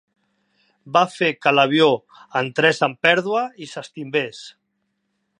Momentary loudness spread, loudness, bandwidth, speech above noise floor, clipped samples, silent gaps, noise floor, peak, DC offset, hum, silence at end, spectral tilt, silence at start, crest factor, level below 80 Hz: 15 LU; -19 LUFS; 10.5 kHz; 53 dB; under 0.1%; none; -73 dBFS; 0 dBFS; under 0.1%; none; 0.9 s; -4.5 dB/octave; 0.85 s; 20 dB; -72 dBFS